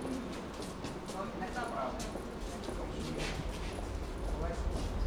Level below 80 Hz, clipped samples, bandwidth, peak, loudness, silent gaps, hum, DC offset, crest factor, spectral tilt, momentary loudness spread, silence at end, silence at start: -42 dBFS; under 0.1%; 16 kHz; -22 dBFS; -40 LUFS; none; none; under 0.1%; 16 dB; -5.5 dB/octave; 4 LU; 0 s; 0 s